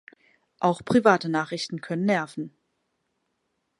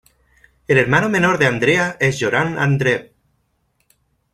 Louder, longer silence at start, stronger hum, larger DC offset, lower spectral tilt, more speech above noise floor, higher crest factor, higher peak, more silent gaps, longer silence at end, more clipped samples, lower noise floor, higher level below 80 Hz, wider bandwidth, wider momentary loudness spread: second, -24 LUFS vs -16 LUFS; about the same, 0.6 s vs 0.7 s; neither; neither; about the same, -6 dB/octave vs -5.5 dB/octave; about the same, 52 dB vs 49 dB; first, 24 dB vs 18 dB; about the same, -4 dBFS vs -2 dBFS; neither; about the same, 1.3 s vs 1.3 s; neither; first, -76 dBFS vs -66 dBFS; second, -66 dBFS vs -50 dBFS; second, 11.5 kHz vs 14 kHz; first, 15 LU vs 4 LU